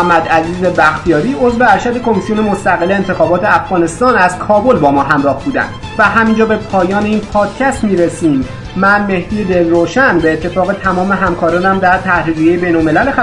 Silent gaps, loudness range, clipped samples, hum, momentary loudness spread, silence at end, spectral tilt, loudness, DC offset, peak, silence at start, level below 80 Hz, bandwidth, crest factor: none; 1 LU; 0.2%; none; 5 LU; 0 s; -6 dB/octave; -11 LUFS; under 0.1%; 0 dBFS; 0 s; -34 dBFS; 11 kHz; 12 dB